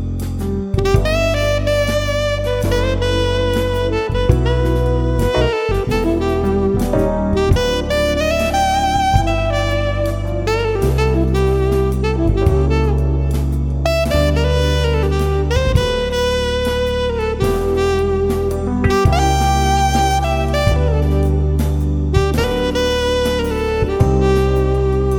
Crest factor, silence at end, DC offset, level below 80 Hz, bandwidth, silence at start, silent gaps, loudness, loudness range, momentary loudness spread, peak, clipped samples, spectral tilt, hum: 14 dB; 0 s; under 0.1%; -20 dBFS; 17 kHz; 0 s; none; -17 LUFS; 1 LU; 4 LU; 0 dBFS; under 0.1%; -6 dB/octave; none